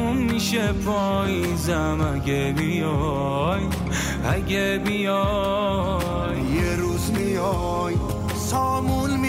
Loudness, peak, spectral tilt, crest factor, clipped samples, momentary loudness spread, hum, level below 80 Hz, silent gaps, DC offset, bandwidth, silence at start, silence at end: -23 LUFS; -10 dBFS; -5.5 dB/octave; 12 dB; under 0.1%; 3 LU; none; -34 dBFS; none; under 0.1%; 16 kHz; 0 s; 0 s